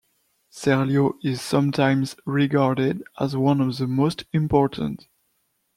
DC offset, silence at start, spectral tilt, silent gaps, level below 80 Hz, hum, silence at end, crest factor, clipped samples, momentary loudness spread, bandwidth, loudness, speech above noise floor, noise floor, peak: under 0.1%; 0.55 s; -7 dB/octave; none; -52 dBFS; none; 0.8 s; 18 dB; under 0.1%; 7 LU; 14.5 kHz; -22 LUFS; 49 dB; -71 dBFS; -4 dBFS